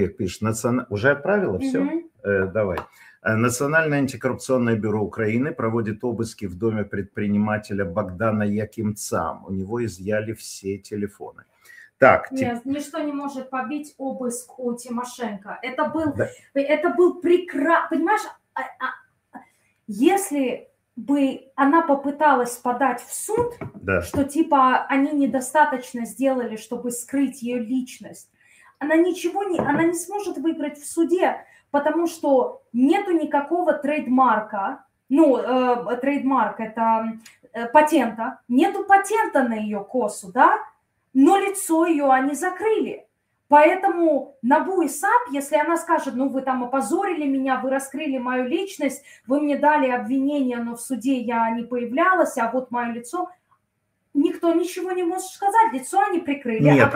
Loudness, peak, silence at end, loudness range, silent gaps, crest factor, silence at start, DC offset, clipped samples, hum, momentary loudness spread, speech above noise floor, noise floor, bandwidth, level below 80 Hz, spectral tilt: -22 LUFS; -2 dBFS; 0 s; 5 LU; none; 20 dB; 0 s; under 0.1%; under 0.1%; none; 12 LU; 51 dB; -73 dBFS; 16 kHz; -60 dBFS; -5.5 dB/octave